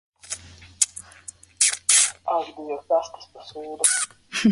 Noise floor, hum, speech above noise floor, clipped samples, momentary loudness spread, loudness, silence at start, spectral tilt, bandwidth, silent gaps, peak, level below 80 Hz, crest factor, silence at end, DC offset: -45 dBFS; none; 19 dB; under 0.1%; 24 LU; -21 LUFS; 0.25 s; -1.5 dB/octave; 12 kHz; none; 0 dBFS; -60 dBFS; 24 dB; 0 s; under 0.1%